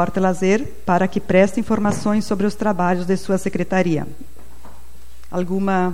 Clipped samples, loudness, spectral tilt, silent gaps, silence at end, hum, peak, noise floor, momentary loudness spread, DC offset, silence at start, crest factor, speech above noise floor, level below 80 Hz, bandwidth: under 0.1%; -20 LUFS; -6.5 dB/octave; none; 0 s; none; -2 dBFS; -44 dBFS; 6 LU; 5%; 0 s; 18 dB; 25 dB; -44 dBFS; 16 kHz